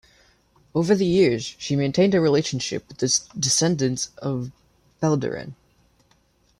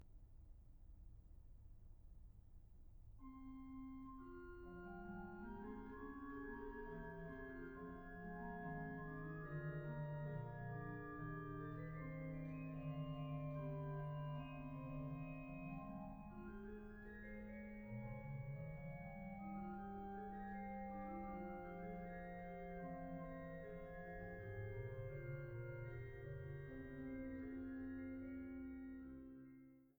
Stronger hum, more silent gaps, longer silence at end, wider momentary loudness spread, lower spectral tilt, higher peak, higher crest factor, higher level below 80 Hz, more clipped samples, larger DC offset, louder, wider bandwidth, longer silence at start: neither; neither; first, 1.05 s vs 0.05 s; second, 11 LU vs 15 LU; second, -4.5 dB/octave vs -10 dB/octave; first, -6 dBFS vs -36 dBFS; about the same, 18 dB vs 14 dB; first, -56 dBFS vs -62 dBFS; neither; neither; first, -22 LUFS vs -52 LUFS; second, 14 kHz vs over 20 kHz; first, 0.75 s vs 0 s